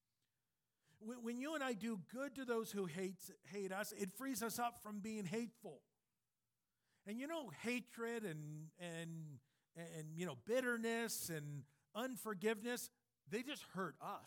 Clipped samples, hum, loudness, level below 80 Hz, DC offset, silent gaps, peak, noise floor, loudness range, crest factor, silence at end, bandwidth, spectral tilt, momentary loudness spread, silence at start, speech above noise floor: under 0.1%; none; -46 LUFS; -88 dBFS; under 0.1%; none; -28 dBFS; under -90 dBFS; 5 LU; 18 dB; 0 s; 19 kHz; -4.5 dB/octave; 12 LU; 1 s; over 44 dB